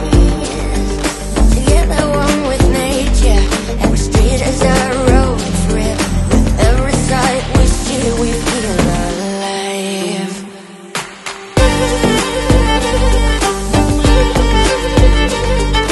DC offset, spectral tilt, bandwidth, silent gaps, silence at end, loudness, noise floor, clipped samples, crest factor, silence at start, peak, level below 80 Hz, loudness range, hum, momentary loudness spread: under 0.1%; -5 dB/octave; 12.5 kHz; none; 0 s; -14 LUFS; -32 dBFS; 0.1%; 12 dB; 0 s; 0 dBFS; -16 dBFS; 4 LU; none; 7 LU